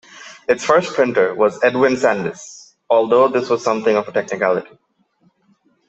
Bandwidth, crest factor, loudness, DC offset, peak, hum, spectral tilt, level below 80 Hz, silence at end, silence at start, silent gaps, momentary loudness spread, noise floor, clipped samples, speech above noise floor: 8.2 kHz; 18 dB; -17 LUFS; under 0.1%; 0 dBFS; none; -5 dB/octave; -62 dBFS; 1.25 s; 0.15 s; none; 11 LU; -60 dBFS; under 0.1%; 44 dB